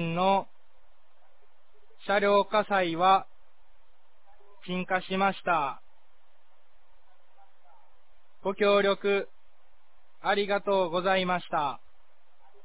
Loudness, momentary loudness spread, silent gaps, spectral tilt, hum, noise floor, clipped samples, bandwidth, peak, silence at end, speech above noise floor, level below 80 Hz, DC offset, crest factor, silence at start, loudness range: -27 LUFS; 12 LU; none; -9 dB/octave; none; -68 dBFS; under 0.1%; 4 kHz; -12 dBFS; 0.9 s; 42 dB; -68 dBFS; 0.8%; 18 dB; 0 s; 5 LU